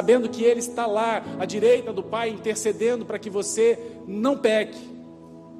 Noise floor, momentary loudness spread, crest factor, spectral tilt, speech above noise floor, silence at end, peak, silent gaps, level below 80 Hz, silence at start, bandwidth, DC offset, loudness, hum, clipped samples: -44 dBFS; 12 LU; 16 dB; -4 dB/octave; 21 dB; 0 s; -8 dBFS; none; -68 dBFS; 0 s; 13.5 kHz; under 0.1%; -24 LUFS; none; under 0.1%